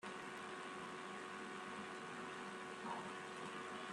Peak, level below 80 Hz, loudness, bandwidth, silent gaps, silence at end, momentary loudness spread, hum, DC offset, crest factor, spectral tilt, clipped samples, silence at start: -34 dBFS; -88 dBFS; -49 LUFS; 13 kHz; none; 0 s; 2 LU; none; under 0.1%; 16 dB; -3.5 dB/octave; under 0.1%; 0 s